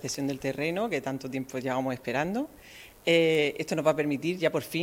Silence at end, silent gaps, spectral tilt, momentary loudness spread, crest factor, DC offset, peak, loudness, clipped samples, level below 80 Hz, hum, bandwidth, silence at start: 0 s; none; -5 dB/octave; 10 LU; 18 dB; under 0.1%; -10 dBFS; -28 LUFS; under 0.1%; -62 dBFS; none; 16 kHz; 0 s